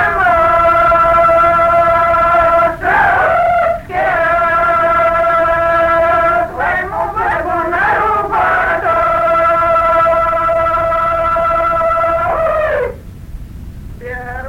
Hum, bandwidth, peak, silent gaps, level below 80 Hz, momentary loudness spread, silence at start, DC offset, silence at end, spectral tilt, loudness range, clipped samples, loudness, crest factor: none; 16 kHz; -2 dBFS; none; -32 dBFS; 7 LU; 0 s; under 0.1%; 0 s; -6 dB/octave; 4 LU; under 0.1%; -12 LUFS; 12 dB